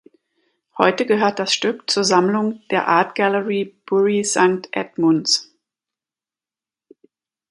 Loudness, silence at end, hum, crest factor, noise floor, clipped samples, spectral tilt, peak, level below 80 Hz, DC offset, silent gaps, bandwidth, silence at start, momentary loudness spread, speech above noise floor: -18 LUFS; 2.1 s; none; 20 dB; under -90 dBFS; under 0.1%; -3.5 dB/octave; 0 dBFS; -68 dBFS; under 0.1%; none; 11.5 kHz; 0.75 s; 6 LU; over 72 dB